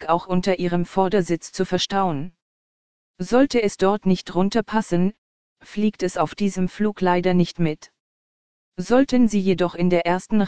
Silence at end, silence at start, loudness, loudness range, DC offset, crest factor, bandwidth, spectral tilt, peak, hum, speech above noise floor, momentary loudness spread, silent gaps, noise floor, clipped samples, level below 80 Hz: 0 s; 0 s; -21 LUFS; 2 LU; 2%; 16 dB; 9.4 kHz; -6.5 dB/octave; -4 dBFS; none; over 70 dB; 7 LU; 2.42-3.14 s, 5.18-5.56 s, 8.00-8.72 s; under -90 dBFS; under 0.1%; -48 dBFS